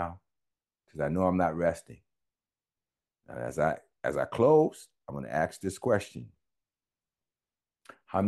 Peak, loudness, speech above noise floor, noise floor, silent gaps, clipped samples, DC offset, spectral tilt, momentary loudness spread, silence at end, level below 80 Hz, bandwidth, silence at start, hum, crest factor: -12 dBFS; -29 LUFS; over 61 dB; under -90 dBFS; none; under 0.1%; under 0.1%; -7 dB/octave; 20 LU; 0 s; -60 dBFS; 12.5 kHz; 0 s; none; 20 dB